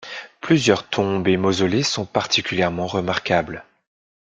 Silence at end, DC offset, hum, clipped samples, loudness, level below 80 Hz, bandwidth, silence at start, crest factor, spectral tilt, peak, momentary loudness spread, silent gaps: 0.6 s; under 0.1%; none; under 0.1%; -20 LUFS; -54 dBFS; 9.4 kHz; 0 s; 18 dB; -4.5 dB/octave; -2 dBFS; 10 LU; none